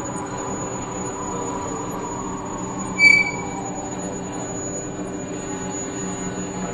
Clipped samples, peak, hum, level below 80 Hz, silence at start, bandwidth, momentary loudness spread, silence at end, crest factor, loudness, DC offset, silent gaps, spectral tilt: under 0.1%; -2 dBFS; none; -48 dBFS; 0 s; 12 kHz; 14 LU; 0 s; 22 dB; -23 LUFS; under 0.1%; none; -3.5 dB/octave